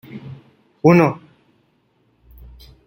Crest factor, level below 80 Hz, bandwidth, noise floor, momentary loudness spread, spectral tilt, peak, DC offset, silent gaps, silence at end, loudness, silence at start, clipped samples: 20 dB; -50 dBFS; 16.5 kHz; -62 dBFS; 24 LU; -8.5 dB/octave; -2 dBFS; under 0.1%; none; 1.7 s; -15 LUFS; 0.15 s; under 0.1%